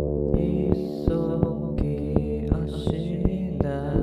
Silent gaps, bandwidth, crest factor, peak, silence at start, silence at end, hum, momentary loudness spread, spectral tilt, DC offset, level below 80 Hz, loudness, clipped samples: none; 10 kHz; 20 dB; -4 dBFS; 0 s; 0 s; none; 3 LU; -10 dB/octave; under 0.1%; -32 dBFS; -26 LUFS; under 0.1%